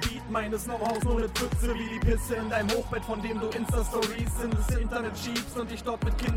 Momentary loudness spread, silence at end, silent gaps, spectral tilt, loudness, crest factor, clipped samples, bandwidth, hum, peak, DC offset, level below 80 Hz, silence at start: 4 LU; 0 s; none; -5 dB/octave; -30 LUFS; 16 dB; under 0.1%; 16.5 kHz; none; -12 dBFS; under 0.1%; -34 dBFS; 0 s